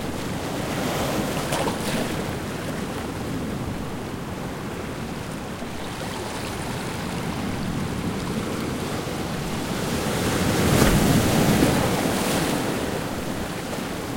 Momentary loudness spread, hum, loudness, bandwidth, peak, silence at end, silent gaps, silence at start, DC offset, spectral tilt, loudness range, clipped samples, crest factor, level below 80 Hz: 12 LU; none; -25 LUFS; 16.5 kHz; -2 dBFS; 0 s; none; 0 s; under 0.1%; -5 dB/octave; 10 LU; under 0.1%; 22 dB; -40 dBFS